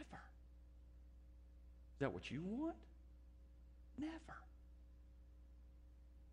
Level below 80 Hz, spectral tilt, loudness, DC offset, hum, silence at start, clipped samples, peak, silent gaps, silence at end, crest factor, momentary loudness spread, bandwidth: -62 dBFS; -7 dB/octave; -49 LUFS; under 0.1%; none; 0 s; under 0.1%; -28 dBFS; none; 0 s; 24 dB; 20 LU; 10 kHz